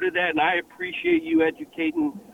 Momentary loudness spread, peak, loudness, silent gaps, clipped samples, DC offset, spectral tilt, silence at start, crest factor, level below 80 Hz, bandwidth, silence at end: 7 LU; -10 dBFS; -24 LUFS; none; under 0.1%; under 0.1%; -6 dB/octave; 0 s; 14 dB; -62 dBFS; 3.9 kHz; 0 s